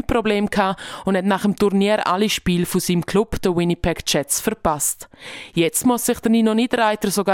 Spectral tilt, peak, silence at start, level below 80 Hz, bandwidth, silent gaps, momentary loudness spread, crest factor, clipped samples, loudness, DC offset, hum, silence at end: -4.5 dB/octave; -2 dBFS; 0.1 s; -40 dBFS; 17 kHz; none; 5 LU; 16 dB; under 0.1%; -19 LUFS; under 0.1%; none; 0 s